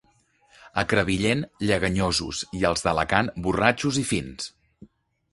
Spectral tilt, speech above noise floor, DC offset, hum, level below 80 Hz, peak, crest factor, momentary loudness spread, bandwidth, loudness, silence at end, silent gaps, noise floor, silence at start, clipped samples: -4.5 dB/octave; 39 dB; under 0.1%; none; -44 dBFS; -2 dBFS; 24 dB; 9 LU; 11.5 kHz; -24 LUFS; 0.45 s; none; -63 dBFS; 0.65 s; under 0.1%